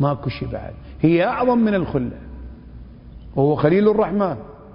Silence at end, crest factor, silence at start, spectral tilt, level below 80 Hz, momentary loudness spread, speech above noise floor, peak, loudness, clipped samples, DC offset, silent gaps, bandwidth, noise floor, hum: 0 s; 18 dB; 0 s; -12.5 dB/octave; -40 dBFS; 20 LU; 21 dB; -2 dBFS; -19 LUFS; under 0.1%; under 0.1%; none; 5.4 kHz; -39 dBFS; none